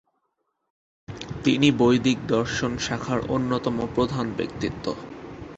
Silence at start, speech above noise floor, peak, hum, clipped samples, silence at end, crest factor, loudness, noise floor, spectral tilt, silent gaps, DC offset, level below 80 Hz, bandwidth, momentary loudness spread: 1.1 s; 52 dB; -6 dBFS; none; under 0.1%; 0 s; 18 dB; -24 LUFS; -76 dBFS; -5.5 dB/octave; none; under 0.1%; -48 dBFS; 8.2 kHz; 16 LU